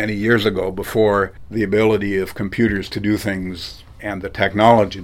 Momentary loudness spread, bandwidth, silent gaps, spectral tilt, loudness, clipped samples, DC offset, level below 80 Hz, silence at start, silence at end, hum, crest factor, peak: 14 LU; 16.5 kHz; none; -6.5 dB/octave; -18 LUFS; under 0.1%; under 0.1%; -42 dBFS; 0 s; 0 s; none; 18 dB; 0 dBFS